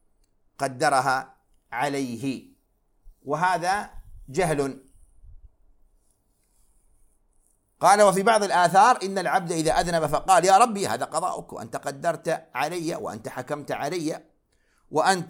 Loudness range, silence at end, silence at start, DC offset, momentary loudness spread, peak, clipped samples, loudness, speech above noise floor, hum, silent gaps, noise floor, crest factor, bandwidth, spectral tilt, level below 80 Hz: 10 LU; 0 s; 0.6 s; under 0.1%; 16 LU; -4 dBFS; under 0.1%; -23 LUFS; 44 dB; none; none; -67 dBFS; 22 dB; 17 kHz; -4 dB/octave; -52 dBFS